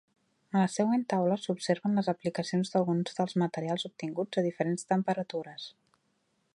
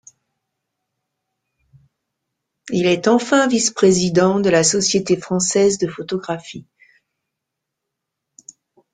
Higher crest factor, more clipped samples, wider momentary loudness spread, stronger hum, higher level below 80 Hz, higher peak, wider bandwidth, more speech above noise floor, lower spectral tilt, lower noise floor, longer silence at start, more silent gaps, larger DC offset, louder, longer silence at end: about the same, 18 dB vs 18 dB; neither; second, 8 LU vs 11 LU; neither; second, -78 dBFS vs -56 dBFS; second, -12 dBFS vs -2 dBFS; first, 11.5 kHz vs 9.6 kHz; second, 45 dB vs 64 dB; first, -6 dB/octave vs -4 dB/octave; second, -75 dBFS vs -81 dBFS; second, 0.55 s vs 2.65 s; neither; neither; second, -31 LUFS vs -17 LUFS; second, 0.85 s vs 2.35 s